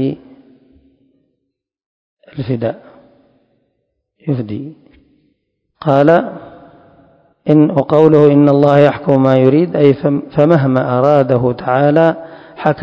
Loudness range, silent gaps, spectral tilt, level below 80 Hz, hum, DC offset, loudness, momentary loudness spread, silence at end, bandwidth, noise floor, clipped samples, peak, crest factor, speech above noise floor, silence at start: 17 LU; 1.86-2.17 s; -9.5 dB/octave; -52 dBFS; none; under 0.1%; -12 LUFS; 18 LU; 0 s; 6.8 kHz; -73 dBFS; 0.5%; 0 dBFS; 14 dB; 62 dB; 0 s